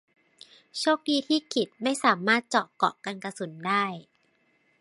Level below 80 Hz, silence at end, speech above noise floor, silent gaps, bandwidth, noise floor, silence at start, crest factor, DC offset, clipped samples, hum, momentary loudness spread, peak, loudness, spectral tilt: -80 dBFS; 0.8 s; 41 dB; none; 11.5 kHz; -68 dBFS; 0.75 s; 22 dB; under 0.1%; under 0.1%; none; 12 LU; -6 dBFS; -27 LUFS; -3.5 dB/octave